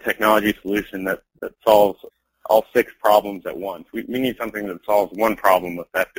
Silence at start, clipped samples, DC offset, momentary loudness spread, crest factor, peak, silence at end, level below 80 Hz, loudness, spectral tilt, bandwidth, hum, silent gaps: 0.05 s; under 0.1%; under 0.1%; 13 LU; 20 dB; 0 dBFS; 0.15 s; -54 dBFS; -20 LUFS; -4.5 dB/octave; 16.5 kHz; none; none